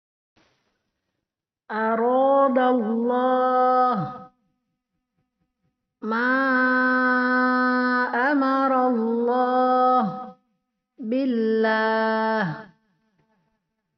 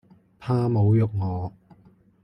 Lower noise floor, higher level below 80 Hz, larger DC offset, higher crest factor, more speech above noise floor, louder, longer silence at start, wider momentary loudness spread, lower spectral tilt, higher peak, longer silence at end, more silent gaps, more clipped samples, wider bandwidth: first, -85 dBFS vs -56 dBFS; second, -74 dBFS vs -56 dBFS; neither; about the same, 14 dB vs 14 dB; first, 64 dB vs 35 dB; first, -21 LUFS vs -24 LUFS; first, 1.7 s vs 0.4 s; second, 10 LU vs 15 LU; second, -3.5 dB/octave vs -10.5 dB/octave; about the same, -8 dBFS vs -10 dBFS; first, 1.35 s vs 0.75 s; neither; neither; about the same, 5.8 kHz vs 5.6 kHz